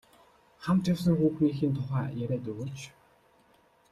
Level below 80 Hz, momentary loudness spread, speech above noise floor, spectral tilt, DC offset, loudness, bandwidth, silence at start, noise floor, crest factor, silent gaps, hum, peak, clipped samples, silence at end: -60 dBFS; 14 LU; 36 dB; -8 dB/octave; under 0.1%; -29 LUFS; 13.5 kHz; 0.6 s; -64 dBFS; 16 dB; none; none; -14 dBFS; under 0.1%; 1 s